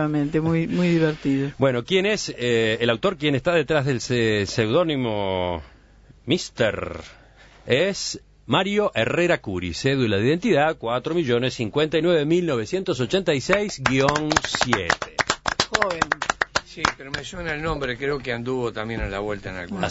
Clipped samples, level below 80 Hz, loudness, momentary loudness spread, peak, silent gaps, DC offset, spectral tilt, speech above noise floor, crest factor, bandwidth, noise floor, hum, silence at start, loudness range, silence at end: under 0.1%; -46 dBFS; -22 LUFS; 8 LU; -2 dBFS; none; under 0.1%; -5 dB/octave; 29 dB; 22 dB; 8 kHz; -51 dBFS; none; 0 s; 4 LU; 0 s